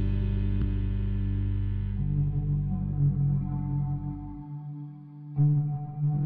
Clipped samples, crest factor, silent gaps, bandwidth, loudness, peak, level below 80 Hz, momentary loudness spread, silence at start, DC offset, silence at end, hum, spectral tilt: under 0.1%; 14 dB; none; 3.6 kHz; -29 LUFS; -14 dBFS; -34 dBFS; 14 LU; 0 s; under 0.1%; 0 s; none; -11 dB/octave